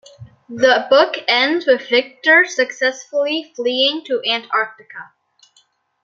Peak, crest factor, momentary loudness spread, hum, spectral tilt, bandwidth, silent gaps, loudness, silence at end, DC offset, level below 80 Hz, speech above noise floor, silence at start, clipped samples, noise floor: 0 dBFS; 18 dB; 11 LU; none; -2 dB/octave; 7.6 kHz; none; -16 LUFS; 1 s; under 0.1%; -66 dBFS; 42 dB; 0.2 s; under 0.1%; -59 dBFS